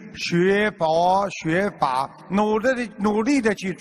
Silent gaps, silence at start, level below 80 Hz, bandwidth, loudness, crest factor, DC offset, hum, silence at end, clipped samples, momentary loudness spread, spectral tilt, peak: none; 0 s; -54 dBFS; 13 kHz; -21 LUFS; 16 dB; under 0.1%; none; 0 s; under 0.1%; 5 LU; -5.5 dB/octave; -6 dBFS